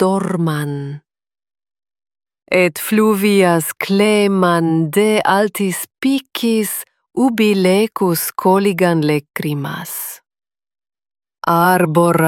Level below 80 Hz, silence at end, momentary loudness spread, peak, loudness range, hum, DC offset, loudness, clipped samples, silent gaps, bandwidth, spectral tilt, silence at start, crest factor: -60 dBFS; 0 s; 11 LU; 0 dBFS; 5 LU; none; under 0.1%; -16 LUFS; under 0.1%; none; 17 kHz; -5.5 dB/octave; 0 s; 16 dB